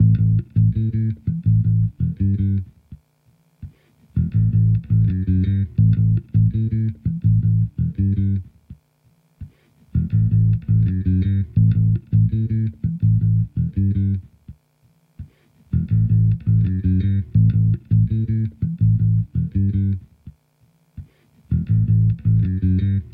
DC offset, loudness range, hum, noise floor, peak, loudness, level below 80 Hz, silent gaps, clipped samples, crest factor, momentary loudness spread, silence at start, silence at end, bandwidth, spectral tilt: under 0.1%; 4 LU; none; -60 dBFS; -6 dBFS; -19 LUFS; -34 dBFS; none; under 0.1%; 12 dB; 6 LU; 0 s; 0 s; 2.3 kHz; -12.5 dB/octave